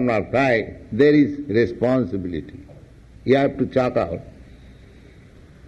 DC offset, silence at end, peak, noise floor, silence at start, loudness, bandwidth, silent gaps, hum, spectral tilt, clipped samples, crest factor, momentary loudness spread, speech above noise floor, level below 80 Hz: under 0.1%; 0.95 s; -4 dBFS; -46 dBFS; 0 s; -20 LUFS; 8 kHz; none; none; -8 dB/octave; under 0.1%; 18 dB; 15 LU; 27 dB; -46 dBFS